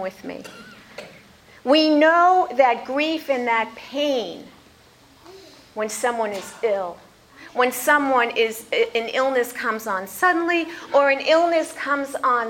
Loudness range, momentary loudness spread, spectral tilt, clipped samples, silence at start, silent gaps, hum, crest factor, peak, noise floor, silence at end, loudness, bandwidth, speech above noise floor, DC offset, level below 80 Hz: 8 LU; 17 LU; -2.5 dB/octave; under 0.1%; 0 s; none; none; 18 dB; -4 dBFS; -52 dBFS; 0 s; -20 LUFS; 17 kHz; 31 dB; under 0.1%; -66 dBFS